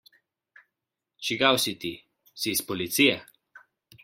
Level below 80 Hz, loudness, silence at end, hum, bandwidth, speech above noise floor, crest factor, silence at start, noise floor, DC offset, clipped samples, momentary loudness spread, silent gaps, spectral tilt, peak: -68 dBFS; -25 LUFS; 0.45 s; none; 16.5 kHz; 61 dB; 24 dB; 1.2 s; -86 dBFS; under 0.1%; under 0.1%; 14 LU; none; -2.5 dB/octave; -4 dBFS